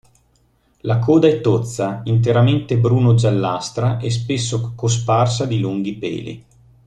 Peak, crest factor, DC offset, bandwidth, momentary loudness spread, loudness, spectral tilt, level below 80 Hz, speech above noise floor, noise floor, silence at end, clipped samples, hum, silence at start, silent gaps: -2 dBFS; 16 dB; under 0.1%; 9.6 kHz; 10 LU; -18 LUFS; -6.5 dB/octave; -48 dBFS; 42 dB; -59 dBFS; 0.45 s; under 0.1%; none; 0.85 s; none